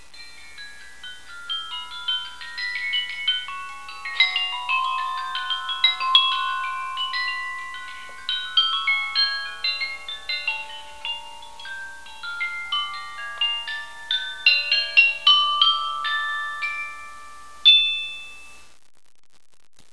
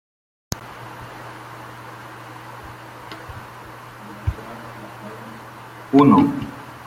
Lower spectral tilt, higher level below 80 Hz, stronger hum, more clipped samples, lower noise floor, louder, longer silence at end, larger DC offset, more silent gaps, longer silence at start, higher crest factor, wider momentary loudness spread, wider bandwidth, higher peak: second, 2 dB/octave vs -7 dB/octave; second, -62 dBFS vs -46 dBFS; neither; neither; first, -46 dBFS vs -39 dBFS; about the same, -21 LUFS vs -19 LUFS; first, 1.3 s vs 0.15 s; first, 0.8% vs under 0.1%; neither; second, 0.15 s vs 0.5 s; about the same, 24 dB vs 22 dB; about the same, 22 LU vs 23 LU; second, 11 kHz vs 15.5 kHz; about the same, 0 dBFS vs -2 dBFS